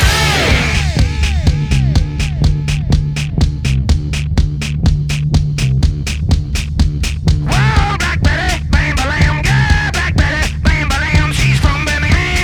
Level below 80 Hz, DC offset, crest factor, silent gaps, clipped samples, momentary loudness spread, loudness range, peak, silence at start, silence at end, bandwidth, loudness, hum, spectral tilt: -16 dBFS; under 0.1%; 12 dB; none; under 0.1%; 4 LU; 2 LU; 0 dBFS; 0 s; 0 s; 18 kHz; -14 LUFS; none; -5 dB/octave